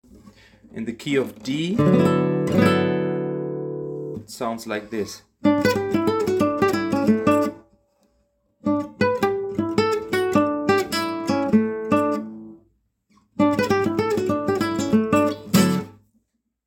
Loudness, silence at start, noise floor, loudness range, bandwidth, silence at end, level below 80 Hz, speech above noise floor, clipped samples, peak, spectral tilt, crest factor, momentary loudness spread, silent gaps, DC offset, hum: -22 LUFS; 0.75 s; -70 dBFS; 3 LU; 17 kHz; 0.75 s; -56 dBFS; 48 dB; under 0.1%; -4 dBFS; -6 dB/octave; 18 dB; 11 LU; none; under 0.1%; none